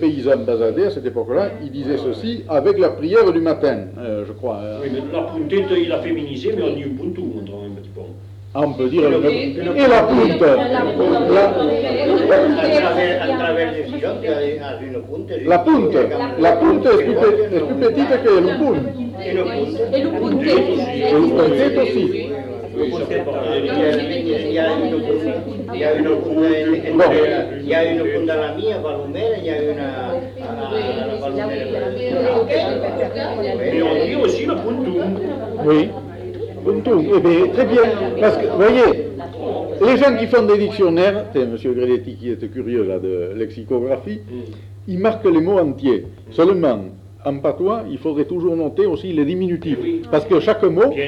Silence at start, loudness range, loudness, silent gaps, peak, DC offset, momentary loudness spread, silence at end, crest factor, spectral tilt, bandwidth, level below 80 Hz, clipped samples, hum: 0 s; 7 LU; -17 LUFS; none; -2 dBFS; under 0.1%; 12 LU; 0 s; 14 dB; -7.5 dB/octave; 8.2 kHz; -50 dBFS; under 0.1%; none